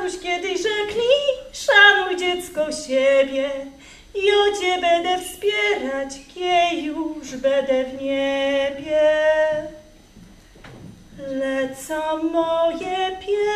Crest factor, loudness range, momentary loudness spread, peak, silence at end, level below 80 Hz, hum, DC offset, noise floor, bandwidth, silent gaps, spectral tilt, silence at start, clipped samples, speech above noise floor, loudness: 20 dB; 7 LU; 10 LU; -2 dBFS; 0 s; -52 dBFS; none; under 0.1%; -46 dBFS; 14.5 kHz; none; -2.5 dB/octave; 0 s; under 0.1%; 25 dB; -20 LUFS